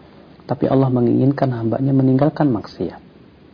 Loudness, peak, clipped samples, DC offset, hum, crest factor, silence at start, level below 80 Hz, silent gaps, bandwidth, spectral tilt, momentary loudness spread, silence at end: -18 LUFS; -4 dBFS; under 0.1%; under 0.1%; none; 14 dB; 0.5 s; -50 dBFS; none; 5.4 kHz; -11 dB/octave; 12 LU; 0.55 s